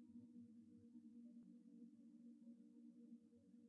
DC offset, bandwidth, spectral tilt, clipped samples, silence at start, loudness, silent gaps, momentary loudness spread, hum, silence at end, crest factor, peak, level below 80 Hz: under 0.1%; 1.8 kHz; -11 dB/octave; under 0.1%; 0 s; -65 LUFS; none; 3 LU; none; 0 s; 12 dB; -52 dBFS; under -90 dBFS